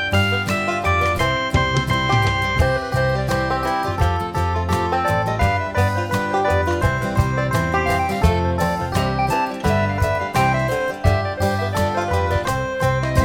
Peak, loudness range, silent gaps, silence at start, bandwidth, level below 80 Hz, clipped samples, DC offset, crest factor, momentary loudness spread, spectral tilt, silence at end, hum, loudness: -2 dBFS; 1 LU; none; 0 s; 17.5 kHz; -30 dBFS; under 0.1%; under 0.1%; 16 dB; 3 LU; -5.5 dB/octave; 0 s; none; -20 LUFS